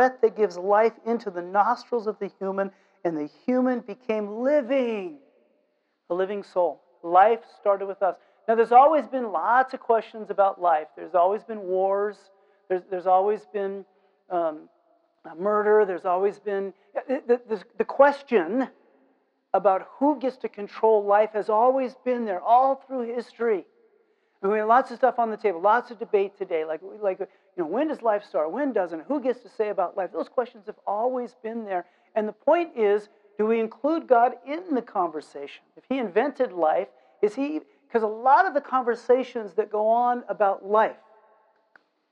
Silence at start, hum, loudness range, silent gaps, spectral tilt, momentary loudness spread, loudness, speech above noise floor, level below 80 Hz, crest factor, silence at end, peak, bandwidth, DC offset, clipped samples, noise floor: 0 s; none; 6 LU; none; -6.5 dB/octave; 12 LU; -25 LUFS; 47 dB; -78 dBFS; 20 dB; 1.2 s; -6 dBFS; 8.2 kHz; under 0.1%; under 0.1%; -71 dBFS